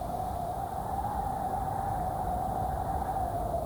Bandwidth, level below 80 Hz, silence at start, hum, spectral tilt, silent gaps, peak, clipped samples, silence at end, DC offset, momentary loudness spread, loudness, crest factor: over 20 kHz; -42 dBFS; 0 s; none; -7 dB/octave; none; -20 dBFS; under 0.1%; 0 s; under 0.1%; 2 LU; -33 LUFS; 12 dB